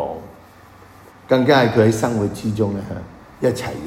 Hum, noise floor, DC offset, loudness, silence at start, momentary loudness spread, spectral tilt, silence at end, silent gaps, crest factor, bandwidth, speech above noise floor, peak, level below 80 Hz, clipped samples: none; -45 dBFS; under 0.1%; -18 LUFS; 0 s; 18 LU; -6 dB/octave; 0 s; none; 18 dB; 16 kHz; 27 dB; -2 dBFS; -48 dBFS; under 0.1%